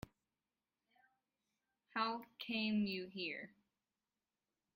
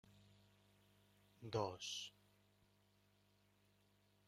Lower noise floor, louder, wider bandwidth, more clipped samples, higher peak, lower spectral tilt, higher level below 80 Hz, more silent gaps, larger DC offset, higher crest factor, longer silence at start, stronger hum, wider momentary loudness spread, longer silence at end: first, under -90 dBFS vs -77 dBFS; first, -42 LUFS vs -47 LUFS; about the same, 15.5 kHz vs 15.5 kHz; neither; first, -24 dBFS vs -28 dBFS; first, -6.5 dB/octave vs -4 dB/octave; about the same, -78 dBFS vs -82 dBFS; neither; neither; about the same, 22 dB vs 26 dB; first, 1.95 s vs 0.05 s; second, none vs 50 Hz at -75 dBFS; about the same, 13 LU vs 12 LU; second, 1.25 s vs 2.2 s